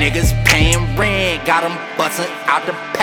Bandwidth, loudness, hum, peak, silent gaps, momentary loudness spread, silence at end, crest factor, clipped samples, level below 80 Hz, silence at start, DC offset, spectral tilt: 19.5 kHz; -15 LUFS; none; 0 dBFS; none; 8 LU; 0 s; 16 dB; under 0.1%; -24 dBFS; 0 s; under 0.1%; -4 dB/octave